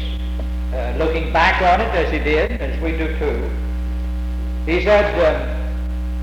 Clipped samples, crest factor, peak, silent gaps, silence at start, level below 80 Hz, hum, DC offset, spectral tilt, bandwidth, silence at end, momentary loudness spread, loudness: under 0.1%; 14 dB; -4 dBFS; none; 0 s; -22 dBFS; none; under 0.1%; -7 dB/octave; 7.6 kHz; 0 s; 11 LU; -19 LUFS